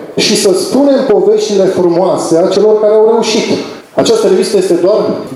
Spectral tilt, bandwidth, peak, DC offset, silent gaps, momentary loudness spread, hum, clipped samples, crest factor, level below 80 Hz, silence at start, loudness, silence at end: -4.5 dB/octave; 13.5 kHz; 0 dBFS; under 0.1%; none; 5 LU; none; under 0.1%; 10 dB; -56 dBFS; 0 s; -9 LUFS; 0 s